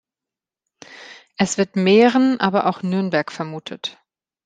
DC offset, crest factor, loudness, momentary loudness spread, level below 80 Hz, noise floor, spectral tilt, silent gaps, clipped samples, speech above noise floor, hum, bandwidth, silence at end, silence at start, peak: under 0.1%; 18 dB; -19 LUFS; 23 LU; -64 dBFS; -88 dBFS; -5 dB/octave; none; under 0.1%; 70 dB; none; 9.4 kHz; 0.55 s; 0.9 s; -2 dBFS